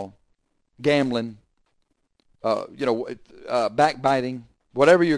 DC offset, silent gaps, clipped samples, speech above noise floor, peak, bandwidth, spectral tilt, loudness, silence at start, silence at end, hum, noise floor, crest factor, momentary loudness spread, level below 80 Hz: under 0.1%; none; under 0.1%; 49 dB; -4 dBFS; 10.5 kHz; -5.5 dB/octave; -23 LUFS; 0 s; 0 s; none; -70 dBFS; 20 dB; 16 LU; -60 dBFS